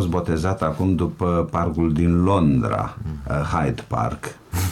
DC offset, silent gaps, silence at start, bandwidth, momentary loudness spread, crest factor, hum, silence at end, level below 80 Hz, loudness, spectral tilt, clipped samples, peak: under 0.1%; none; 0 s; 17 kHz; 9 LU; 14 dB; none; 0 s; -36 dBFS; -22 LUFS; -7.5 dB/octave; under 0.1%; -6 dBFS